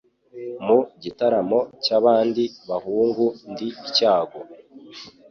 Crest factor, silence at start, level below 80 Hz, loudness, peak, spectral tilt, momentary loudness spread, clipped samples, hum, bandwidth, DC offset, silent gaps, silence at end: 18 dB; 0.35 s; -66 dBFS; -21 LUFS; -4 dBFS; -5.5 dB/octave; 22 LU; under 0.1%; none; 6.8 kHz; under 0.1%; none; 0.2 s